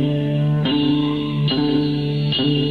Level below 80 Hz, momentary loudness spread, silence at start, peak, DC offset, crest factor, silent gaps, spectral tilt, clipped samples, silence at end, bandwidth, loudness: -44 dBFS; 3 LU; 0 s; -8 dBFS; under 0.1%; 12 dB; none; -8.5 dB/octave; under 0.1%; 0 s; 4.9 kHz; -19 LUFS